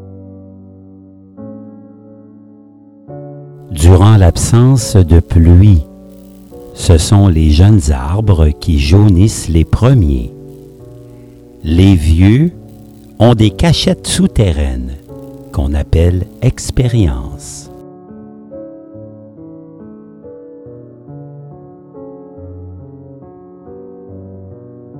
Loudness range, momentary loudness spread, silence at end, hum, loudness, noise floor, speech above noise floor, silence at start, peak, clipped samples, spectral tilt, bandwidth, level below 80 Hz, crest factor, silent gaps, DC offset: 24 LU; 25 LU; 0 s; none; -10 LUFS; -40 dBFS; 31 dB; 0 s; 0 dBFS; 0.5%; -6.5 dB/octave; 13 kHz; -20 dBFS; 12 dB; none; under 0.1%